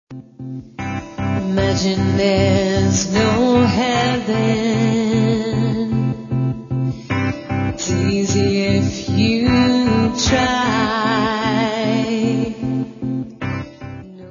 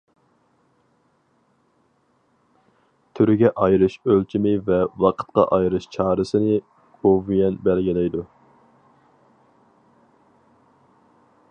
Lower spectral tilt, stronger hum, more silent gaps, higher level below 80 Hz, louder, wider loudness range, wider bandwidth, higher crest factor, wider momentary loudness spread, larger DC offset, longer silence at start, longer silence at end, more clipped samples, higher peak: second, -5.5 dB/octave vs -8.5 dB/octave; neither; neither; first, -40 dBFS vs -50 dBFS; about the same, -18 LUFS vs -20 LUFS; second, 4 LU vs 8 LU; second, 7.4 kHz vs 8.6 kHz; about the same, 16 dB vs 20 dB; first, 11 LU vs 6 LU; neither; second, 0.1 s vs 3.15 s; second, 0 s vs 3.25 s; neither; about the same, -2 dBFS vs -2 dBFS